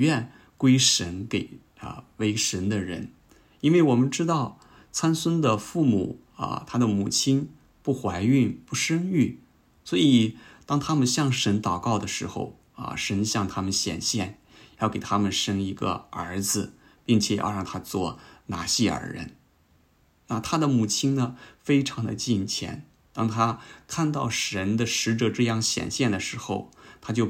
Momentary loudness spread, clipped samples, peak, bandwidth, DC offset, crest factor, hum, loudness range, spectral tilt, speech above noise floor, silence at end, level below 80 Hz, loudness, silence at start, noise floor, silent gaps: 14 LU; under 0.1%; -4 dBFS; 16 kHz; under 0.1%; 22 dB; none; 4 LU; -4.5 dB/octave; 38 dB; 0 s; -58 dBFS; -25 LUFS; 0 s; -63 dBFS; none